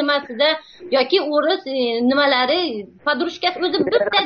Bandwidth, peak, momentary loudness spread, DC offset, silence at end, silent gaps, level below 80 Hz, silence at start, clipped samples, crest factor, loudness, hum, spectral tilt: 6.6 kHz; -2 dBFS; 6 LU; under 0.1%; 0 s; none; -62 dBFS; 0 s; under 0.1%; 16 dB; -19 LUFS; none; 0 dB/octave